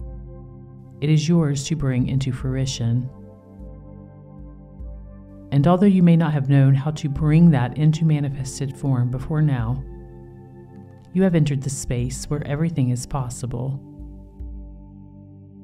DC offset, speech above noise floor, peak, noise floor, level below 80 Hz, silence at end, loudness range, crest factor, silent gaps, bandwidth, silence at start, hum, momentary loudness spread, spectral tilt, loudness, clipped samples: under 0.1%; 24 dB; -4 dBFS; -43 dBFS; -40 dBFS; 0 s; 9 LU; 16 dB; none; 12 kHz; 0 s; 50 Hz at -50 dBFS; 26 LU; -7 dB/octave; -21 LUFS; under 0.1%